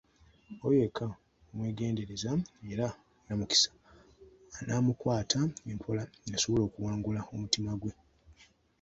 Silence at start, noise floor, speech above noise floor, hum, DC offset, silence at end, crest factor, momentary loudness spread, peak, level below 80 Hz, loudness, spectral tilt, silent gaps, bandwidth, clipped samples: 0.5 s; -63 dBFS; 31 dB; none; under 0.1%; 0.4 s; 24 dB; 13 LU; -10 dBFS; -58 dBFS; -32 LUFS; -4.5 dB/octave; none; 8.2 kHz; under 0.1%